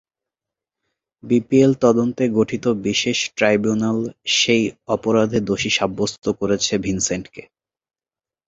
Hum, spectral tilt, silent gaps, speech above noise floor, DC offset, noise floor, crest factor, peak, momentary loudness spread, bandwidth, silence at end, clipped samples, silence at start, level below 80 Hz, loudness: none; -4 dB/octave; none; over 71 dB; under 0.1%; under -90 dBFS; 18 dB; -2 dBFS; 7 LU; 8 kHz; 1.05 s; under 0.1%; 1.25 s; -52 dBFS; -19 LUFS